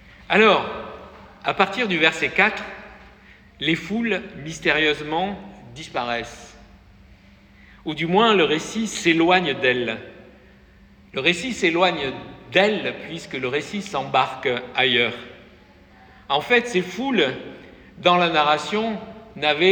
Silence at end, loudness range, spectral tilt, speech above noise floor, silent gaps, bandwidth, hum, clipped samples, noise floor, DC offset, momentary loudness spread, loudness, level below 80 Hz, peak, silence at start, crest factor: 0 s; 4 LU; -4 dB/octave; 29 dB; none; 18.5 kHz; none; under 0.1%; -50 dBFS; under 0.1%; 17 LU; -21 LUFS; -54 dBFS; -4 dBFS; 0.3 s; 20 dB